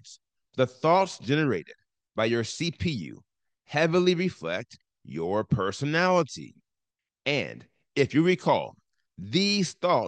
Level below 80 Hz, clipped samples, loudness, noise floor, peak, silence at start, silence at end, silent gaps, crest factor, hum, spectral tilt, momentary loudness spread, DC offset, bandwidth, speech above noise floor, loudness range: -64 dBFS; under 0.1%; -26 LUFS; -88 dBFS; -8 dBFS; 0.05 s; 0 s; none; 18 dB; none; -5.5 dB/octave; 15 LU; under 0.1%; 9.8 kHz; 62 dB; 2 LU